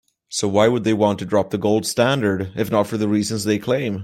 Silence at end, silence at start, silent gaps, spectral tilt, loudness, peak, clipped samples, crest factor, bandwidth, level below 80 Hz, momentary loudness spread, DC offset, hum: 0 s; 0.3 s; none; -5 dB/octave; -20 LUFS; -2 dBFS; under 0.1%; 16 dB; 15.5 kHz; -58 dBFS; 5 LU; under 0.1%; none